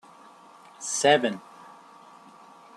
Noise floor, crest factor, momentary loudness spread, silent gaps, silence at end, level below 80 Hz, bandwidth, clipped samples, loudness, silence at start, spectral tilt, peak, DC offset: -51 dBFS; 22 dB; 20 LU; none; 1.35 s; -78 dBFS; 13 kHz; under 0.1%; -24 LUFS; 0.8 s; -2.5 dB/octave; -6 dBFS; under 0.1%